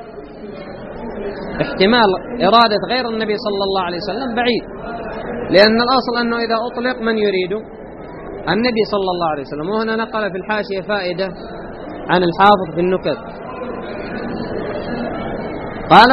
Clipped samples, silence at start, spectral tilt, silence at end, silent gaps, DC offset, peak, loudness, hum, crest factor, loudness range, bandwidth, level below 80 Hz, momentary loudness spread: under 0.1%; 0 s; -2.5 dB/octave; 0 s; none; under 0.1%; 0 dBFS; -17 LUFS; none; 18 dB; 4 LU; 6 kHz; -42 dBFS; 18 LU